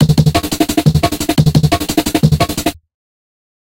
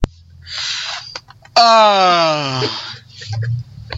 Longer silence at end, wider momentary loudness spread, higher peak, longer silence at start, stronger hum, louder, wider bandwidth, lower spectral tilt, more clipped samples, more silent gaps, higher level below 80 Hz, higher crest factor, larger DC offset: first, 1 s vs 0 s; second, 4 LU vs 20 LU; about the same, 0 dBFS vs 0 dBFS; about the same, 0 s vs 0 s; neither; about the same, -13 LUFS vs -14 LUFS; first, 17 kHz vs 8 kHz; first, -5.5 dB/octave vs -4 dB/octave; neither; neither; first, -30 dBFS vs -36 dBFS; about the same, 14 dB vs 16 dB; first, 0.4% vs under 0.1%